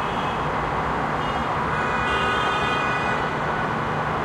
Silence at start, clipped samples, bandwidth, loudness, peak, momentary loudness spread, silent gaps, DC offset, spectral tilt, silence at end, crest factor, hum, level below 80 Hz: 0 s; under 0.1%; 14.5 kHz; -23 LUFS; -10 dBFS; 3 LU; none; under 0.1%; -5.5 dB/octave; 0 s; 14 dB; none; -40 dBFS